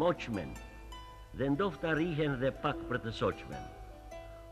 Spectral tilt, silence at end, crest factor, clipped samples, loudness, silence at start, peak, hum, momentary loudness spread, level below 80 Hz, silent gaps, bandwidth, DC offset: -7 dB/octave; 0 s; 18 dB; under 0.1%; -35 LUFS; 0 s; -18 dBFS; none; 17 LU; -52 dBFS; none; 14 kHz; under 0.1%